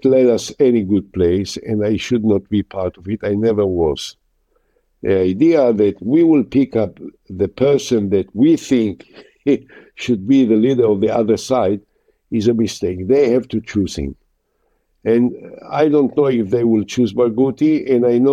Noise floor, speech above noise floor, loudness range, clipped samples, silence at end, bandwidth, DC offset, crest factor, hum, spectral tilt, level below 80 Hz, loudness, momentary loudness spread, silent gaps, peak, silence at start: -65 dBFS; 50 dB; 3 LU; under 0.1%; 0 s; 12.5 kHz; under 0.1%; 14 dB; none; -6.5 dB/octave; -46 dBFS; -16 LUFS; 10 LU; none; -2 dBFS; 0.05 s